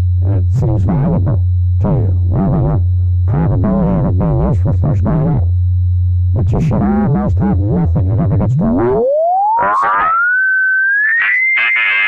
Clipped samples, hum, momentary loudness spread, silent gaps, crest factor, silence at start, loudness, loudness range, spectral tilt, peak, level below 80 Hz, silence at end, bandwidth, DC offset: under 0.1%; none; 4 LU; none; 6 dB; 0 s; -13 LUFS; 2 LU; -9 dB/octave; -6 dBFS; -24 dBFS; 0 s; 3.9 kHz; under 0.1%